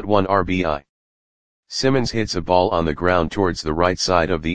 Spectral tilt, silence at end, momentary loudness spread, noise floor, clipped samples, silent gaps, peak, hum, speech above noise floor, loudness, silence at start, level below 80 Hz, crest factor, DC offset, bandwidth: -5 dB/octave; 0 s; 5 LU; under -90 dBFS; under 0.1%; 0.89-1.63 s; 0 dBFS; none; over 71 dB; -20 LUFS; 0 s; -40 dBFS; 18 dB; 2%; 9.8 kHz